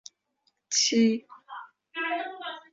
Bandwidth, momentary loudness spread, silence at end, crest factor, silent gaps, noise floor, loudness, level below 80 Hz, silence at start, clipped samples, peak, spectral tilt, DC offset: 7.8 kHz; 22 LU; 0.1 s; 20 dB; none; -74 dBFS; -26 LUFS; -78 dBFS; 0.7 s; under 0.1%; -10 dBFS; -2 dB/octave; under 0.1%